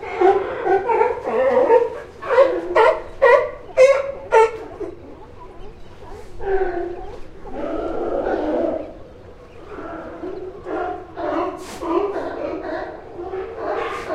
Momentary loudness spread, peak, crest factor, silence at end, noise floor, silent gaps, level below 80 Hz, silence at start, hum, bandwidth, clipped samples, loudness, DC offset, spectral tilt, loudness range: 21 LU; -2 dBFS; 20 dB; 0 s; -40 dBFS; none; -42 dBFS; 0 s; none; 11 kHz; under 0.1%; -20 LUFS; under 0.1%; -5.5 dB/octave; 11 LU